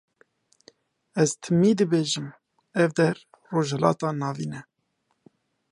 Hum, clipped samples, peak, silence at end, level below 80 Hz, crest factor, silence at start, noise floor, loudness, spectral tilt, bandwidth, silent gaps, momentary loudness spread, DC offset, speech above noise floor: none; under 0.1%; -4 dBFS; 1.1 s; -68 dBFS; 22 dB; 1.15 s; -74 dBFS; -25 LUFS; -5.5 dB/octave; 11.5 kHz; none; 13 LU; under 0.1%; 51 dB